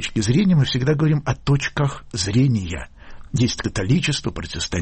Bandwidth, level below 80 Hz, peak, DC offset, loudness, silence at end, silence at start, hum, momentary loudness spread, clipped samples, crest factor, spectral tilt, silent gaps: 8.8 kHz; -38 dBFS; -6 dBFS; under 0.1%; -20 LUFS; 0 s; 0 s; none; 10 LU; under 0.1%; 14 dB; -5.5 dB/octave; none